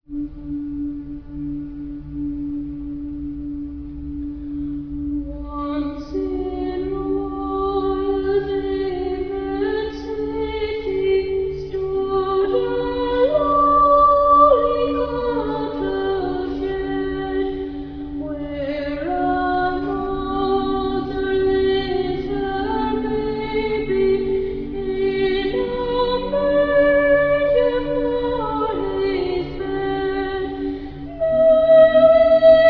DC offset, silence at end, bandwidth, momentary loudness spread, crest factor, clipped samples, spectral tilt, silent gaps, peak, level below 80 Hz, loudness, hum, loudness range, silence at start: under 0.1%; 0 s; 5.4 kHz; 16 LU; 16 dB; under 0.1%; -8.5 dB/octave; none; -2 dBFS; -36 dBFS; -20 LUFS; none; 12 LU; 0.1 s